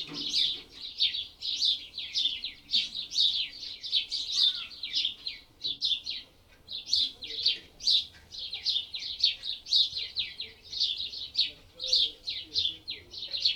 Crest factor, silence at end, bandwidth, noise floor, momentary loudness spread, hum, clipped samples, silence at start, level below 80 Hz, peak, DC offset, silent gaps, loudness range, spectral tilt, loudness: 22 dB; 0 s; 19.5 kHz; -55 dBFS; 13 LU; none; under 0.1%; 0 s; -62 dBFS; -10 dBFS; under 0.1%; none; 2 LU; 0.5 dB/octave; -28 LUFS